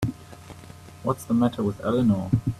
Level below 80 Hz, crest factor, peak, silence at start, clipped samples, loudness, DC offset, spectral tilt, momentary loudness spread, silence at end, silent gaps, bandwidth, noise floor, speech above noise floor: -50 dBFS; 18 dB; -8 dBFS; 0 s; under 0.1%; -25 LUFS; under 0.1%; -8 dB/octave; 22 LU; 0 s; none; 13.5 kHz; -44 dBFS; 21 dB